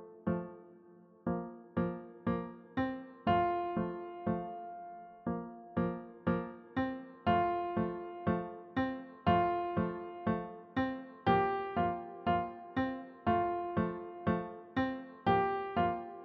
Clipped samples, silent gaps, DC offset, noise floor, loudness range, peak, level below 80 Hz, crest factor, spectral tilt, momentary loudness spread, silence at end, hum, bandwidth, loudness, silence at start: under 0.1%; none; under 0.1%; -59 dBFS; 4 LU; -16 dBFS; -60 dBFS; 20 dB; -6 dB/octave; 9 LU; 0 s; none; 5.8 kHz; -36 LUFS; 0 s